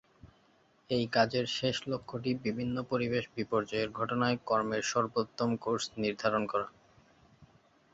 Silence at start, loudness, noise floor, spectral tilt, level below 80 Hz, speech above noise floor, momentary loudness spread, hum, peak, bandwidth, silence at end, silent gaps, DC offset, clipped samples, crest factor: 0.25 s; -32 LUFS; -67 dBFS; -5 dB/octave; -66 dBFS; 35 dB; 6 LU; none; -12 dBFS; 8 kHz; 0.5 s; none; under 0.1%; under 0.1%; 20 dB